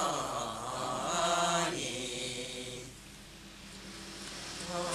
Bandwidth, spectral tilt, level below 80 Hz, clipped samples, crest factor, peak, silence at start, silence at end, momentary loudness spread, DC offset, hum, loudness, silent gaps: 14.5 kHz; -2.5 dB/octave; -60 dBFS; under 0.1%; 20 dB; -18 dBFS; 0 s; 0 s; 19 LU; under 0.1%; none; -35 LUFS; none